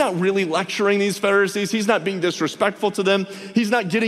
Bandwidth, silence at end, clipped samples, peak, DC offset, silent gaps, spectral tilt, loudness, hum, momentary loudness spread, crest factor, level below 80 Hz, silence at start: 15 kHz; 0 s; under 0.1%; -4 dBFS; under 0.1%; none; -4.5 dB/octave; -20 LUFS; none; 4 LU; 16 dB; -68 dBFS; 0 s